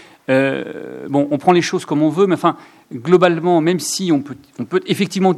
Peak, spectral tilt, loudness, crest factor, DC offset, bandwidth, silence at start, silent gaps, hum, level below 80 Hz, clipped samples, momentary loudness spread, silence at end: 0 dBFS; -5.5 dB/octave; -16 LUFS; 16 dB; under 0.1%; 14 kHz; 0.3 s; none; none; -64 dBFS; under 0.1%; 16 LU; 0 s